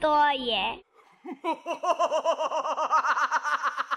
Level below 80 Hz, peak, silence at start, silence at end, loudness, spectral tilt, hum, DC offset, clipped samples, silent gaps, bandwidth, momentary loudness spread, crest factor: -64 dBFS; -12 dBFS; 0 s; 0 s; -26 LUFS; -2 dB/octave; none; under 0.1%; under 0.1%; none; 12.5 kHz; 9 LU; 14 dB